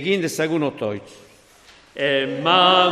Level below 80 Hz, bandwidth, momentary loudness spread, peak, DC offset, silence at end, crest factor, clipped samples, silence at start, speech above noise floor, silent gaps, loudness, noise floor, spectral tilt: -64 dBFS; 15.5 kHz; 15 LU; -2 dBFS; under 0.1%; 0 s; 18 dB; under 0.1%; 0 s; 31 dB; none; -19 LUFS; -50 dBFS; -4 dB/octave